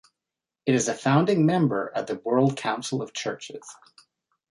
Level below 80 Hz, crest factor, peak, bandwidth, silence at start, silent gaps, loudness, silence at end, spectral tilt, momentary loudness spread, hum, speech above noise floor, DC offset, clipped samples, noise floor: -68 dBFS; 18 dB; -8 dBFS; 11.5 kHz; 0.65 s; none; -24 LUFS; 0.8 s; -5.5 dB/octave; 15 LU; none; 64 dB; under 0.1%; under 0.1%; -88 dBFS